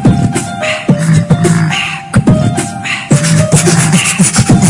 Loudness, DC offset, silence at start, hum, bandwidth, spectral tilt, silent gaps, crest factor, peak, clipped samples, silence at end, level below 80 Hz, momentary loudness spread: -10 LUFS; under 0.1%; 0 s; none; 11.5 kHz; -5 dB/octave; none; 10 dB; 0 dBFS; 0.1%; 0 s; -32 dBFS; 7 LU